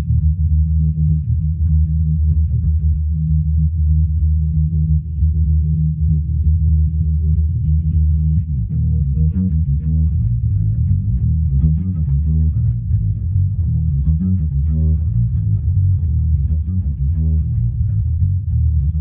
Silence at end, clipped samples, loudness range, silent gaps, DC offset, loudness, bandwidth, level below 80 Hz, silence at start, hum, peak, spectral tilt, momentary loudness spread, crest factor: 0 s; under 0.1%; 1 LU; none; under 0.1%; -17 LUFS; 0.6 kHz; -18 dBFS; 0 s; none; -4 dBFS; -16.5 dB/octave; 2 LU; 12 dB